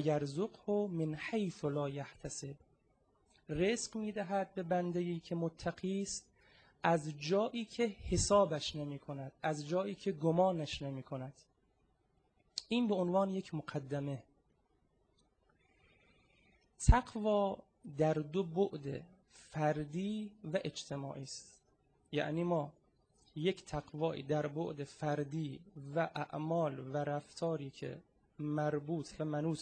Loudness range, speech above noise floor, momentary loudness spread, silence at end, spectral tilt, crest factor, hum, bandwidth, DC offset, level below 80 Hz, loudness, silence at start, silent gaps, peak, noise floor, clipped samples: 5 LU; 39 dB; 12 LU; 0 s; -5.5 dB/octave; 26 dB; none; 9.4 kHz; under 0.1%; -48 dBFS; -37 LUFS; 0 s; none; -12 dBFS; -76 dBFS; under 0.1%